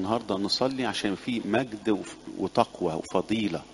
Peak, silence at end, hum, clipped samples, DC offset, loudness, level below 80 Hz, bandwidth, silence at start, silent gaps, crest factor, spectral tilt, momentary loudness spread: -6 dBFS; 0 s; none; under 0.1%; under 0.1%; -28 LUFS; -60 dBFS; 11.5 kHz; 0 s; none; 22 dB; -5 dB/octave; 5 LU